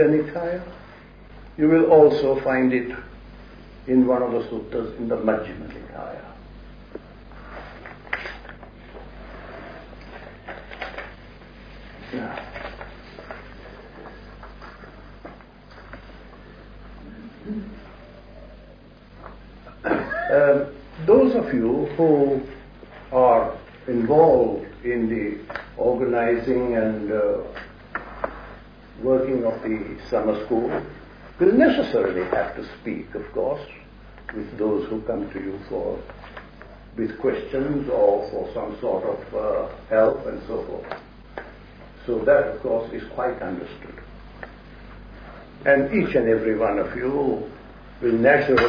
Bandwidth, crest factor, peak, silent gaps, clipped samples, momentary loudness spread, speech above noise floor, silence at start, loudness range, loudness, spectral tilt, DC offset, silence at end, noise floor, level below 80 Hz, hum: 5.2 kHz; 20 dB; -4 dBFS; none; under 0.1%; 25 LU; 25 dB; 0 s; 19 LU; -22 LUFS; -8.5 dB/octave; under 0.1%; 0 s; -46 dBFS; -46 dBFS; none